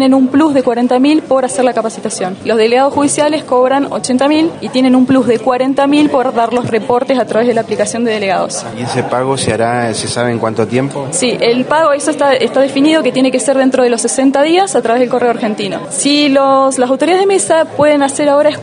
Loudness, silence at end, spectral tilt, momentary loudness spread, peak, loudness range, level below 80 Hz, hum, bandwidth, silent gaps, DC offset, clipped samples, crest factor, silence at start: -12 LUFS; 0 s; -4 dB/octave; 5 LU; 0 dBFS; 3 LU; -54 dBFS; none; 11 kHz; none; under 0.1%; under 0.1%; 12 dB; 0 s